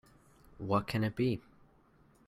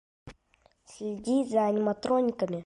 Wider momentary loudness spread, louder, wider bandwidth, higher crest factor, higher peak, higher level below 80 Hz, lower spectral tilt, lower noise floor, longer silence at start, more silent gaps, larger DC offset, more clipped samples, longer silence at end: about the same, 10 LU vs 11 LU; second, -34 LUFS vs -28 LUFS; first, 15 kHz vs 11 kHz; about the same, 20 dB vs 16 dB; about the same, -16 dBFS vs -14 dBFS; about the same, -62 dBFS vs -64 dBFS; about the same, -7.5 dB/octave vs -6.5 dB/octave; about the same, -65 dBFS vs -67 dBFS; first, 0.6 s vs 0.25 s; neither; neither; neither; first, 0.85 s vs 0 s